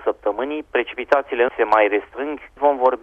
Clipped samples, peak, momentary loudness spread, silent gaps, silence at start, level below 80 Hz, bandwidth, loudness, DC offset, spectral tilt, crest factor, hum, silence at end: under 0.1%; -2 dBFS; 10 LU; none; 0 s; -54 dBFS; 7.2 kHz; -20 LUFS; under 0.1%; -5 dB/octave; 18 dB; none; 0.05 s